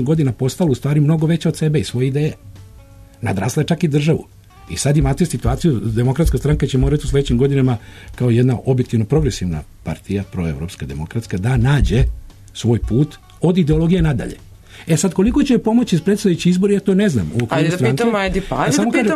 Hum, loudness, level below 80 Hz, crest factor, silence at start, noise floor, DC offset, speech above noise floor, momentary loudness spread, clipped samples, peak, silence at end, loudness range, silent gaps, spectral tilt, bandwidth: none; -17 LUFS; -28 dBFS; 12 dB; 0 s; -41 dBFS; under 0.1%; 25 dB; 9 LU; under 0.1%; -4 dBFS; 0 s; 4 LU; none; -6.5 dB/octave; 13.5 kHz